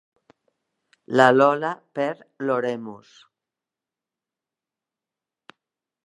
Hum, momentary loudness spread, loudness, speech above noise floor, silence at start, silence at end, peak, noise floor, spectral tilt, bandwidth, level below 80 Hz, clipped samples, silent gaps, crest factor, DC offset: none; 15 LU; -21 LUFS; 67 dB; 1.1 s; 3.1 s; -2 dBFS; -89 dBFS; -6 dB/octave; 11.5 kHz; -78 dBFS; under 0.1%; none; 24 dB; under 0.1%